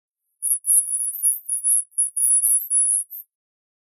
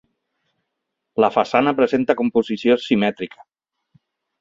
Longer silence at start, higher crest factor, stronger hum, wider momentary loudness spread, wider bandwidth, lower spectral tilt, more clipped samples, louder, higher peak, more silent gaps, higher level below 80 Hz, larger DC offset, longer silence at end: second, 0.4 s vs 1.15 s; about the same, 18 dB vs 20 dB; neither; second, 7 LU vs 10 LU; first, 15.5 kHz vs 7.6 kHz; second, 8 dB/octave vs -6.5 dB/octave; neither; about the same, -18 LUFS vs -19 LUFS; second, -4 dBFS vs 0 dBFS; neither; second, under -90 dBFS vs -62 dBFS; neither; second, 0.6 s vs 1.15 s